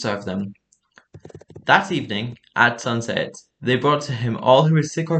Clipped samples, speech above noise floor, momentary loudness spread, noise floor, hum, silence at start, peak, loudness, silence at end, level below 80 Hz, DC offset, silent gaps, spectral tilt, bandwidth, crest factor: under 0.1%; 37 dB; 13 LU; -56 dBFS; none; 0 s; 0 dBFS; -20 LUFS; 0 s; -62 dBFS; under 0.1%; none; -5.5 dB/octave; 8.8 kHz; 20 dB